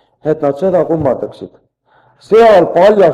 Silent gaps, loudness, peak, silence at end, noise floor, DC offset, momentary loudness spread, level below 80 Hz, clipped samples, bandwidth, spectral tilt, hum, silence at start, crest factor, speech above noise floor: none; -11 LUFS; 0 dBFS; 0 s; -52 dBFS; under 0.1%; 12 LU; -46 dBFS; 0.1%; 10.5 kHz; -7 dB/octave; none; 0.25 s; 12 dB; 42 dB